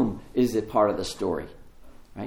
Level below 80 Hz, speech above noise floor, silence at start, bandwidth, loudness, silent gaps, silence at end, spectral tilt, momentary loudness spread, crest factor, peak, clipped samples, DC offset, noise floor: -48 dBFS; 21 dB; 0 s; 17 kHz; -26 LUFS; none; 0 s; -6 dB/octave; 15 LU; 18 dB; -8 dBFS; under 0.1%; under 0.1%; -46 dBFS